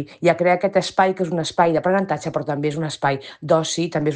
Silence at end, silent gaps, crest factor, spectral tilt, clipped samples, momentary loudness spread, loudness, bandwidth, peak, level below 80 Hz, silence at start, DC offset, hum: 0 s; none; 16 dB; -5 dB/octave; under 0.1%; 6 LU; -20 LUFS; 10 kHz; -4 dBFS; -58 dBFS; 0 s; under 0.1%; none